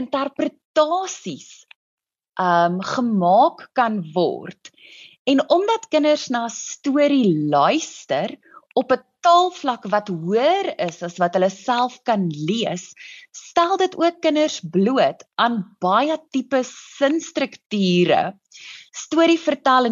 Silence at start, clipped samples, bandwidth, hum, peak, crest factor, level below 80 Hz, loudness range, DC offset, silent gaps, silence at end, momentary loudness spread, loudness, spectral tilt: 0 s; under 0.1%; 7.8 kHz; none; -4 dBFS; 16 dB; -72 dBFS; 2 LU; under 0.1%; 0.65-0.74 s, 1.76-1.98 s, 5.19-5.25 s, 17.66-17.70 s; 0 s; 12 LU; -20 LUFS; -5 dB/octave